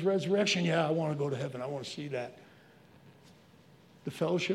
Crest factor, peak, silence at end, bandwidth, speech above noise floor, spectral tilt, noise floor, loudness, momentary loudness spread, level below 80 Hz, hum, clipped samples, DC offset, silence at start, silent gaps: 18 dB; -16 dBFS; 0 s; 13.5 kHz; 28 dB; -5 dB/octave; -59 dBFS; -32 LUFS; 13 LU; -80 dBFS; none; under 0.1%; under 0.1%; 0 s; none